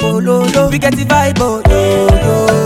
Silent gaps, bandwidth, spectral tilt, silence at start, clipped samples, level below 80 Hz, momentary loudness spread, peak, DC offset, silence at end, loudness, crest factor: none; 17 kHz; -5.5 dB/octave; 0 s; 0.1%; -20 dBFS; 2 LU; 0 dBFS; under 0.1%; 0 s; -11 LUFS; 10 dB